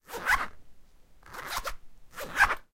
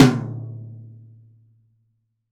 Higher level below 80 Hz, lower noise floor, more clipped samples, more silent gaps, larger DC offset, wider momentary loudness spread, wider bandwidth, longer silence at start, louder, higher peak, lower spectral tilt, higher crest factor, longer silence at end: first, -46 dBFS vs -52 dBFS; second, -53 dBFS vs -69 dBFS; neither; neither; neither; second, 19 LU vs 23 LU; first, 16.5 kHz vs 14.5 kHz; about the same, 0.1 s vs 0 s; second, -29 LUFS vs -24 LUFS; second, -10 dBFS vs -2 dBFS; second, -1.5 dB/octave vs -6.5 dB/octave; about the same, 22 dB vs 22 dB; second, 0.1 s vs 1.45 s